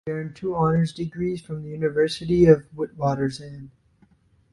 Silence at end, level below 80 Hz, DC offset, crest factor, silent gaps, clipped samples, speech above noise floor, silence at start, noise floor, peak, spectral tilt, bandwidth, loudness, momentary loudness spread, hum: 0.85 s; -50 dBFS; under 0.1%; 22 dB; none; under 0.1%; 37 dB; 0.05 s; -60 dBFS; -2 dBFS; -7.5 dB/octave; 11.5 kHz; -23 LUFS; 16 LU; none